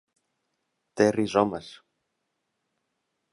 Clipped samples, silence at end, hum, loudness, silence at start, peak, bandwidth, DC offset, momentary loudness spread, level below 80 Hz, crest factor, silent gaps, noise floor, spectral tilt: under 0.1%; 1.6 s; none; -24 LUFS; 0.95 s; -6 dBFS; 11.5 kHz; under 0.1%; 17 LU; -66 dBFS; 24 dB; none; -80 dBFS; -5.5 dB/octave